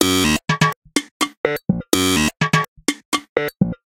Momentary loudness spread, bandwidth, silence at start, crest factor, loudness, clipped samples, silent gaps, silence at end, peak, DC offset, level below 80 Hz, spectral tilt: 7 LU; 17 kHz; 0 s; 20 dB; -19 LUFS; under 0.1%; 0.76-0.82 s, 1.11-1.20 s, 1.37-1.44 s, 2.68-2.76 s, 3.05-3.12 s, 3.29-3.36 s; 0.1 s; 0 dBFS; under 0.1%; -42 dBFS; -4 dB/octave